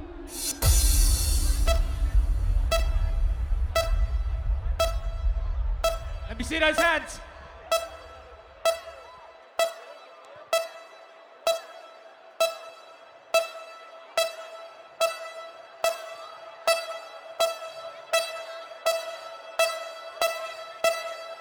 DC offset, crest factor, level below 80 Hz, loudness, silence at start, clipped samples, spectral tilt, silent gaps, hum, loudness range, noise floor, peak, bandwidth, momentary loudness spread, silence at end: under 0.1%; 20 dB; -30 dBFS; -28 LUFS; 0 s; under 0.1%; -3 dB/octave; none; none; 6 LU; -50 dBFS; -8 dBFS; over 20 kHz; 21 LU; 0 s